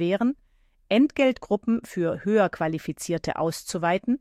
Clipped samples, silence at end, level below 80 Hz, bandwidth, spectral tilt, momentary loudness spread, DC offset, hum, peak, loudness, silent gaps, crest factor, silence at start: under 0.1%; 0.05 s; -56 dBFS; 14.5 kHz; -5.5 dB/octave; 7 LU; under 0.1%; none; -8 dBFS; -25 LUFS; none; 16 dB; 0 s